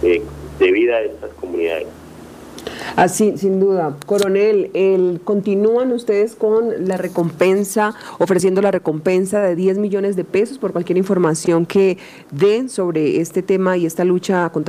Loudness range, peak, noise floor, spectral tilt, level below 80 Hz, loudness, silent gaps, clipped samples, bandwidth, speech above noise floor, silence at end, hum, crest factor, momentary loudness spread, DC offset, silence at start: 2 LU; 0 dBFS; -37 dBFS; -6 dB/octave; -50 dBFS; -17 LUFS; none; under 0.1%; 15.5 kHz; 20 dB; 0 s; none; 16 dB; 8 LU; under 0.1%; 0 s